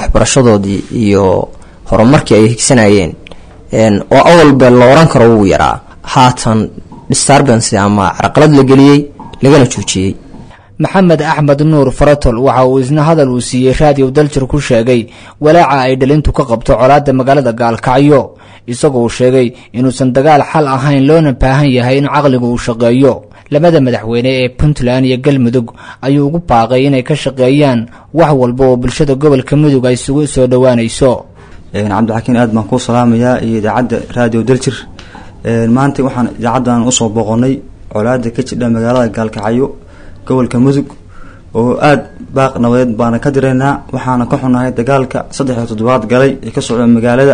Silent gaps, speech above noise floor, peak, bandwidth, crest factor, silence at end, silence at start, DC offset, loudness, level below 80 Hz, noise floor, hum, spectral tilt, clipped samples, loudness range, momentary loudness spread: none; 24 dB; 0 dBFS; 10.5 kHz; 8 dB; 0 s; 0 s; under 0.1%; -9 LUFS; -28 dBFS; -32 dBFS; none; -6 dB/octave; 0.9%; 6 LU; 9 LU